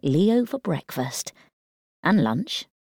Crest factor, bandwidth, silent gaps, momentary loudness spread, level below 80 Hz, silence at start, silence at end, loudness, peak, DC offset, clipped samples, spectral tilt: 16 dB; 19.5 kHz; 1.53-2.03 s; 10 LU; -64 dBFS; 0.05 s; 0.2 s; -24 LUFS; -8 dBFS; under 0.1%; under 0.1%; -5.5 dB/octave